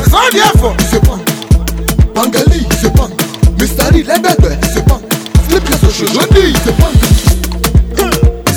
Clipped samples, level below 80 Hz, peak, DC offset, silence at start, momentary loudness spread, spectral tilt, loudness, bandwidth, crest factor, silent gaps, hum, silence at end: 3%; -12 dBFS; 0 dBFS; under 0.1%; 0 s; 5 LU; -5 dB/octave; -10 LUFS; over 20 kHz; 8 dB; none; none; 0 s